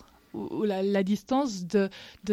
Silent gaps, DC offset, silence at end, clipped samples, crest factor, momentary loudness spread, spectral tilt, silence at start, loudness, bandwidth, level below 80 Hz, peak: none; under 0.1%; 0 s; under 0.1%; 14 dB; 13 LU; -6 dB/octave; 0.35 s; -28 LUFS; 13.5 kHz; -64 dBFS; -14 dBFS